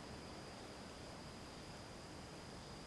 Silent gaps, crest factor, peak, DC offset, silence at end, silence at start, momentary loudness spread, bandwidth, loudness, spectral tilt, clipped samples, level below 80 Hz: none; 14 dB; -40 dBFS; under 0.1%; 0 s; 0 s; 1 LU; 12 kHz; -53 LUFS; -4 dB/octave; under 0.1%; -64 dBFS